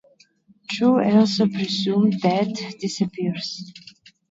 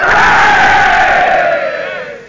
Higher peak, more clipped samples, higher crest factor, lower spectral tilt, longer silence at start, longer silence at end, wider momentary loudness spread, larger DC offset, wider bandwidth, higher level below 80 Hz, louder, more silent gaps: second, -4 dBFS vs 0 dBFS; neither; first, 18 dB vs 8 dB; first, -6 dB/octave vs -3 dB/octave; first, 0.7 s vs 0 s; first, 0.5 s vs 0 s; first, 14 LU vs 11 LU; neither; about the same, 7.8 kHz vs 7.6 kHz; second, -66 dBFS vs -34 dBFS; second, -21 LUFS vs -8 LUFS; neither